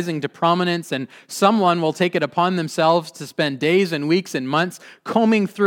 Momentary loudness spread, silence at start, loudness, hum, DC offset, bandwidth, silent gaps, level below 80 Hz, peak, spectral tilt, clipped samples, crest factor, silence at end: 9 LU; 0 s; -20 LUFS; none; under 0.1%; 17.5 kHz; none; -74 dBFS; -2 dBFS; -5.5 dB/octave; under 0.1%; 18 dB; 0 s